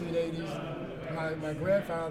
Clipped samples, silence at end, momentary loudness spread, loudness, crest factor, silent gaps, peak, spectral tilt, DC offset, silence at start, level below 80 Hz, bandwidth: under 0.1%; 0 s; 9 LU; -33 LUFS; 16 dB; none; -18 dBFS; -7 dB/octave; under 0.1%; 0 s; -56 dBFS; 15 kHz